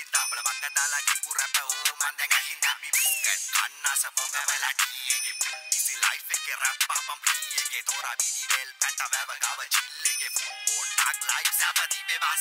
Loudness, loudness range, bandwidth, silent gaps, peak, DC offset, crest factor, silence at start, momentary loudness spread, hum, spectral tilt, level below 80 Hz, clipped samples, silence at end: -25 LUFS; 2 LU; 16.5 kHz; none; -8 dBFS; under 0.1%; 20 dB; 0 s; 5 LU; none; 7.5 dB/octave; under -90 dBFS; under 0.1%; 0 s